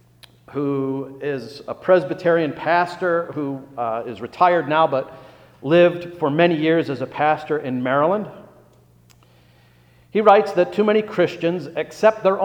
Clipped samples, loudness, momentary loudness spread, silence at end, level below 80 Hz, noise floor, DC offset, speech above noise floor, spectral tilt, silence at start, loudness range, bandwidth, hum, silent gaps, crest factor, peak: under 0.1%; -20 LUFS; 12 LU; 0 s; -64 dBFS; -53 dBFS; under 0.1%; 34 dB; -7 dB/octave; 0.5 s; 3 LU; 9.8 kHz; 60 Hz at -55 dBFS; none; 20 dB; 0 dBFS